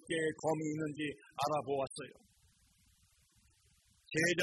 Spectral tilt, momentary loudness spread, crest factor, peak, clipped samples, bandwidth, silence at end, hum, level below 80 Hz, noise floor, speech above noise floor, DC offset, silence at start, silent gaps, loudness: -4.5 dB/octave; 8 LU; 18 dB; -20 dBFS; under 0.1%; 12 kHz; 0 s; none; -74 dBFS; -71 dBFS; 34 dB; under 0.1%; 0.05 s; none; -37 LUFS